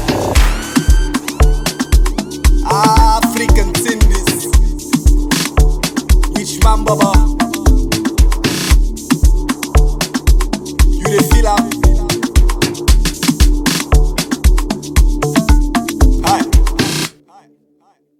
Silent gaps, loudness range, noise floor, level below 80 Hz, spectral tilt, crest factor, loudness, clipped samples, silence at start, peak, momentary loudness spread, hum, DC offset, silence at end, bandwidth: none; 1 LU; -55 dBFS; -14 dBFS; -4.5 dB/octave; 12 dB; -14 LUFS; under 0.1%; 0 s; 0 dBFS; 4 LU; none; under 0.1%; 1.1 s; 16.5 kHz